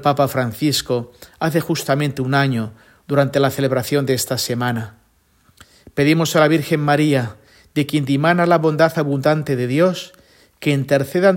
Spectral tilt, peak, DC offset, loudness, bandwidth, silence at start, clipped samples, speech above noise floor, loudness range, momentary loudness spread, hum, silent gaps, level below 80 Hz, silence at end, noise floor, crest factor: -5.5 dB/octave; 0 dBFS; under 0.1%; -18 LUFS; 16.5 kHz; 0 s; under 0.1%; 41 dB; 3 LU; 10 LU; none; none; -56 dBFS; 0 s; -58 dBFS; 18 dB